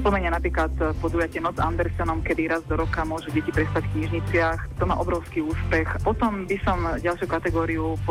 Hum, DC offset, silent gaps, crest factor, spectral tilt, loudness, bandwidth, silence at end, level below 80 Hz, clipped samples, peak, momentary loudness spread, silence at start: none; under 0.1%; none; 14 dB; -7.5 dB/octave; -25 LUFS; 15 kHz; 0 s; -32 dBFS; under 0.1%; -10 dBFS; 3 LU; 0 s